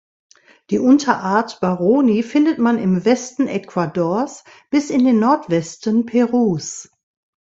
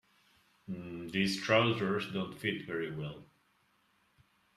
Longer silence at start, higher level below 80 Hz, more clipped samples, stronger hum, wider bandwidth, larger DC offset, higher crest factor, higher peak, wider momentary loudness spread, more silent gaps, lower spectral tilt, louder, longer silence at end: about the same, 0.7 s vs 0.7 s; first, -60 dBFS vs -70 dBFS; neither; neither; second, 8 kHz vs 14 kHz; neither; second, 16 dB vs 22 dB; first, 0 dBFS vs -14 dBFS; second, 8 LU vs 16 LU; neither; about the same, -6 dB/octave vs -5.5 dB/octave; first, -17 LUFS vs -34 LUFS; second, 0.55 s vs 1.35 s